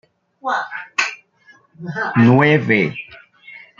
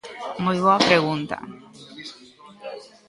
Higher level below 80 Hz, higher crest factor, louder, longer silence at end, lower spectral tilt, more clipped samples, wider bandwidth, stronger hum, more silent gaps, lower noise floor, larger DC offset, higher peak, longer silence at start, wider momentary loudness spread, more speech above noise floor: about the same, -58 dBFS vs -62 dBFS; about the same, 18 dB vs 22 dB; first, -17 LUFS vs -20 LUFS; about the same, 0.2 s vs 0.2 s; first, -6.5 dB/octave vs -5 dB/octave; neither; second, 7.4 kHz vs 11.5 kHz; neither; neither; first, -52 dBFS vs -47 dBFS; neither; about the same, -2 dBFS vs -2 dBFS; first, 0.45 s vs 0.05 s; second, 21 LU vs 24 LU; first, 36 dB vs 26 dB